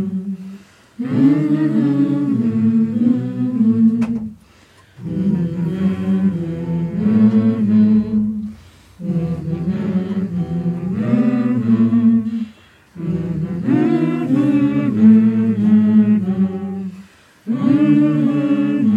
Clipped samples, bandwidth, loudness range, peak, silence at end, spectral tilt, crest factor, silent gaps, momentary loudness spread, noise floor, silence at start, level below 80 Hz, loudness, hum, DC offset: under 0.1%; 5 kHz; 5 LU; -2 dBFS; 0 s; -10 dB/octave; 14 dB; none; 13 LU; -48 dBFS; 0 s; -50 dBFS; -16 LUFS; none; under 0.1%